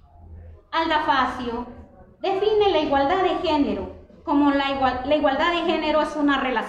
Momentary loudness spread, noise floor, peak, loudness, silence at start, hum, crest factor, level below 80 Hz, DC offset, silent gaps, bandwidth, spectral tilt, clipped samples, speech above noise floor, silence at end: 11 LU; -43 dBFS; -8 dBFS; -22 LUFS; 0.3 s; none; 14 dB; -46 dBFS; under 0.1%; none; 9 kHz; -5.5 dB/octave; under 0.1%; 22 dB; 0 s